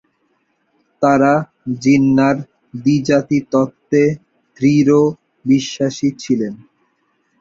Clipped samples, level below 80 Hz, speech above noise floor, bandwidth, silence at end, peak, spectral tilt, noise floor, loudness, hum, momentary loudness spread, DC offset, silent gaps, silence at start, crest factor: under 0.1%; -56 dBFS; 50 dB; 7.6 kHz; 0.85 s; -2 dBFS; -6.5 dB/octave; -64 dBFS; -16 LUFS; none; 10 LU; under 0.1%; none; 1 s; 16 dB